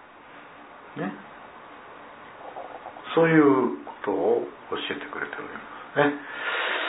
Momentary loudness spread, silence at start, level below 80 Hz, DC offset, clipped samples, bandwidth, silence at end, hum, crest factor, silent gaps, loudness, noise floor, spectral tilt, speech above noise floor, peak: 24 LU; 0 s; -70 dBFS; under 0.1%; under 0.1%; 4 kHz; 0 s; none; 20 dB; none; -25 LUFS; -47 dBFS; -9.5 dB/octave; 23 dB; -6 dBFS